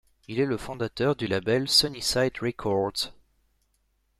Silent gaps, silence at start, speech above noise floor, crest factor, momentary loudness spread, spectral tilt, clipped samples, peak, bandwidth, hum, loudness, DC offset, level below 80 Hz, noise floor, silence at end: none; 0.3 s; 45 dB; 20 dB; 11 LU; -4 dB/octave; under 0.1%; -8 dBFS; 15.5 kHz; none; -26 LUFS; under 0.1%; -54 dBFS; -71 dBFS; 1.1 s